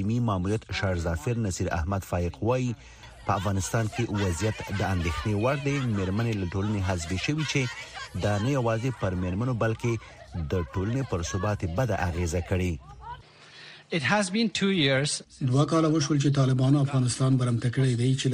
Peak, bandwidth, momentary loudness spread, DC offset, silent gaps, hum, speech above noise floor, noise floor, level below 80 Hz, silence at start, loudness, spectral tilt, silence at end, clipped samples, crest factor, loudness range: -8 dBFS; 15.5 kHz; 9 LU; under 0.1%; none; none; 23 dB; -49 dBFS; -44 dBFS; 0 s; -27 LUFS; -5.5 dB/octave; 0 s; under 0.1%; 18 dB; 5 LU